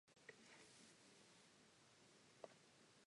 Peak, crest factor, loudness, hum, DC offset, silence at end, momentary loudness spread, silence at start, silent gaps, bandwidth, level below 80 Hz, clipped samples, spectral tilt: -40 dBFS; 28 dB; -66 LUFS; none; under 0.1%; 0 s; 5 LU; 0.05 s; none; 11 kHz; under -90 dBFS; under 0.1%; -2.5 dB/octave